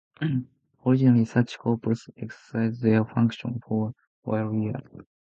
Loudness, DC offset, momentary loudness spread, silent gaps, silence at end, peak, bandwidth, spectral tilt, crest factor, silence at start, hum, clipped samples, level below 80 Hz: -26 LUFS; under 0.1%; 13 LU; 4.07-4.23 s; 0.2 s; -8 dBFS; 7.6 kHz; -8.5 dB/octave; 18 dB; 0.2 s; none; under 0.1%; -62 dBFS